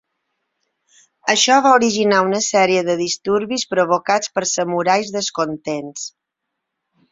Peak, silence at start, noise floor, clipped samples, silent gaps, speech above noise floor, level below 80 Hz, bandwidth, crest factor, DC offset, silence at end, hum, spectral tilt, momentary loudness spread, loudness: -2 dBFS; 1.25 s; -79 dBFS; under 0.1%; none; 62 dB; -64 dBFS; 8 kHz; 18 dB; under 0.1%; 1 s; none; -2.5 dB/octave; 13 LU; -17 LUFS